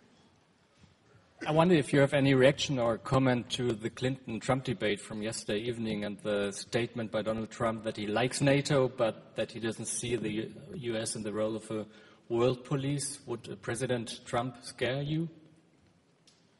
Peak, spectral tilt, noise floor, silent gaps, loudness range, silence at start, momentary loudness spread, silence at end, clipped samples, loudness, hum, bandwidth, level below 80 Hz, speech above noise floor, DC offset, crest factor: -10 dBFS; -5 dB/octave; -66 dBFS; none; 7 LU; 1.4 s; 12 LU; 1.25 s; under 0.1%; -31 LUFS; none; 11.5 kHz; -62 dBFS; 35 dB; under 0.1%; 22 dB